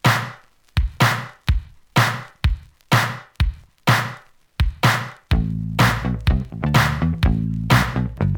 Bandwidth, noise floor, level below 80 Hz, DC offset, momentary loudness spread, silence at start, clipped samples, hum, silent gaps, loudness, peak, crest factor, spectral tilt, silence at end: over 20 kHz; -41 dBFS; -28 dBFS; under 0.1%; 8 LU; 0.05 s; under 0.1%; none; none; -21 LUFS; -2 dBFS; 18 dB; -5 dB/octave; 0 s